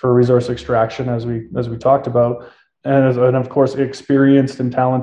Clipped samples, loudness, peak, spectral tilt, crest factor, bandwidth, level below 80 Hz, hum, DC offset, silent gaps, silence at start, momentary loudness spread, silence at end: under 0.1%; -16 LUFS; -2 dBFS; -8.5 dB/octave; 14 dB; 9.2 kHz; -48 dBFS; none; under 0.1%; none; 0.05 s; 9 LU; 0 s